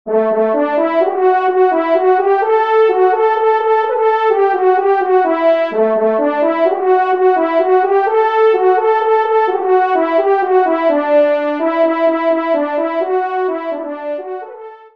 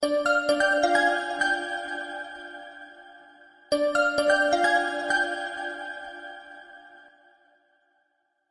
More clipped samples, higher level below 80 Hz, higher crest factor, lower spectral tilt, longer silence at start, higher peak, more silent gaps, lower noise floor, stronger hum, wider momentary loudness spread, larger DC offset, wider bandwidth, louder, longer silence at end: neither; about the same, -68 dBFS vs -64 dBFS; second, 12 dB vs 20 dB; first, -6.5 dB/octave vs -2 dB/octave; about the same, 0.05 s vs 0 s; first, -2 dBFS vs -8 dBFS; neither; second, -33 dBFS vs -73 dBFS; neither; second, 5 LU vs 20 LU; first, 0.3% vs under 0.1%; second, 5.6 kHz vs 11.5 kHz; first, -13 LUFS vs -25 LUFS; second, 0.2 s vs 1.55 s